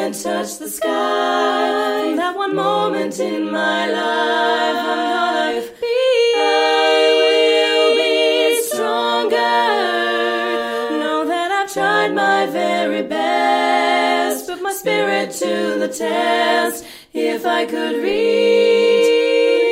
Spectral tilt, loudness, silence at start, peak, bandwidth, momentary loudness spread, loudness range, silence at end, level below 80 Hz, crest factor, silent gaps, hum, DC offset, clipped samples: -2.5 dB/octave; -17 LUFS; 0 s; -4 dBFS; 16 kHz; 8 LU; 4 LU; 0 s; -62 dBFS; 14 dB; none; none; under 0.1%; under 0.1%